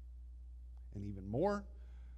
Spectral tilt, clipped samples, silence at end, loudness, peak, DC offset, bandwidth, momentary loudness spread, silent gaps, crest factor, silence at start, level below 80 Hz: -8.5 dB/octave; under 0.1%; 0 s; -41 LUFS; -24 dBFS; under 0.1%; 8.4 kHz; 18 LU; none; 20 dB; 0 s; -52 dBFS